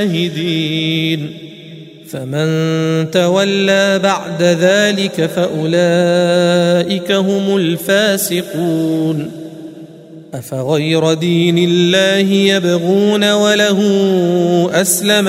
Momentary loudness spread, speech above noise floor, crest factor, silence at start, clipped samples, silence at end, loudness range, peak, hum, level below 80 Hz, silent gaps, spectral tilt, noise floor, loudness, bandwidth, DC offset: 11 LU; 22 dB; 14 dB; 0 s; under 0.1%; 0 s; 5 LU; 0 dBFS; none; -60 dBFS; none; -4.5 dB/octave; -35 dBFS; -13 LUFS; 16 kHz; under 0.1%